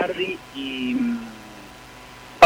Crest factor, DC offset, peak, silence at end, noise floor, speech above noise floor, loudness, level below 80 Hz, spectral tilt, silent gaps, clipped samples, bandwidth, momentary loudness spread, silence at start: 20 dB; under 0.1%; -2 dBFS; 0 s; -43 dBFS; 16 dB; -27 LUFS; -56 dBFS; -4 dB/octave; none; under 0.1%; 16.5 kHz; 18 LU; 0 s